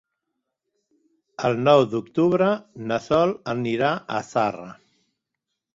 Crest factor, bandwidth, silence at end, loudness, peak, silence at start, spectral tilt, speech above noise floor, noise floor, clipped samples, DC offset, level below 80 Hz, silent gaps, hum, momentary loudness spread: 20 dB; 7.8 kHz; 1 s; -22 LUFS; -4 dBFS; 1.4 s; -6.5 dB/octave; 60 dB; -82 dBFS; under 0.1%; under 0.1%; -60 dBFS; none; none; 11 LU